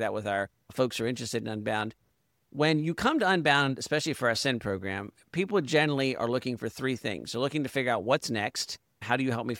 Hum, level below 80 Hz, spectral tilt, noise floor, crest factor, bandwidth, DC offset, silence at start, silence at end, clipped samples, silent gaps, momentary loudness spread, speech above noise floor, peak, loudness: none; -64 dBFS; -4.5 dB/octave; -74 dBFS; 20 dB; 17 kHz; under 0.1%; 0 s; 0 s; under 0.1%; none; 9 LU; 45 dB; -10 dBFS; -29 LUFS